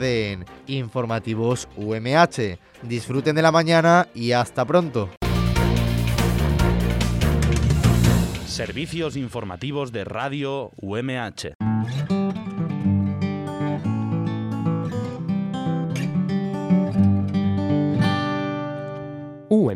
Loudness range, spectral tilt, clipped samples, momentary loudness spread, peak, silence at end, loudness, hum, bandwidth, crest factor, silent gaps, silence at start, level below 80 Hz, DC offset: 7 LU; -6.5 dB/octave; under 0.1%; 11 LU; -2 dBFS; 0 s; -22 LUFS; none; 16.5 kHz; 20 dB; 5.17-5.21 s, 11.55-11.60 s; 0 s; -34 dBFS; under 0.1%